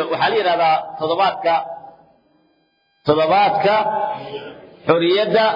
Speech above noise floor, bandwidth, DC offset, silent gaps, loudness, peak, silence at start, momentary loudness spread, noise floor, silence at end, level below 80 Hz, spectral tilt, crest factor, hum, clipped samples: 46 dB; 5.4 kHz; under 0.1%; none; -17 LUFS; -2 dBFS; 0 s; 16 LU; -63 dBFS; 0 s; -62 dBFS; -7 dB/octave; 18 dB; none; under 0.1%